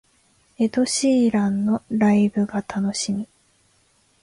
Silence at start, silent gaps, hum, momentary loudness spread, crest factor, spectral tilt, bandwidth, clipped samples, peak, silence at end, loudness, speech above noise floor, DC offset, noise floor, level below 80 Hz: 0.6 s; none; none; 8 LU; 14 dB; -5 dB/octave; 11.5 kHz; under 0.1%; -8 dBFS; 0.95 s; -21 LUFS; 42 dB; under 0.1%; -62 dBFS; -60 dBFS